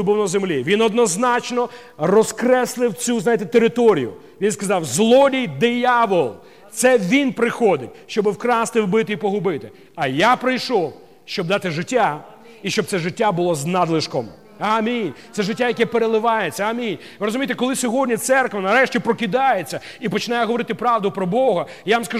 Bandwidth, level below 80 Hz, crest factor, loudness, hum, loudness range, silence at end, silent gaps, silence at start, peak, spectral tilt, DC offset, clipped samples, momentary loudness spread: 16 kHz; -64 dBFS; 16 dB; -19 LUFS; none; 4 LU; 0 s; none; 0 s; -2 dBFS; -4.5 dB/octave; 0.2%; under 0.1%; 9 LU